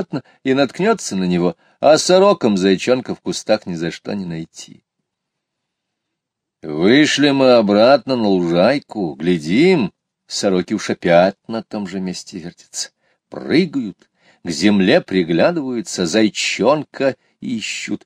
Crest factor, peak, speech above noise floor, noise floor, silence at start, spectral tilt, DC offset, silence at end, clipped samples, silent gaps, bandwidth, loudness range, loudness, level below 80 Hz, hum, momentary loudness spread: 16 dB; 0 dBFS; 63 dB; -79 dBFS; 0 s; -5 dB/octave; under 0.1%; 0.1 s; under 0.1%; none; 14 kHz; 9 LU; -16 LUFS; -58 dBFS; none; 16 LU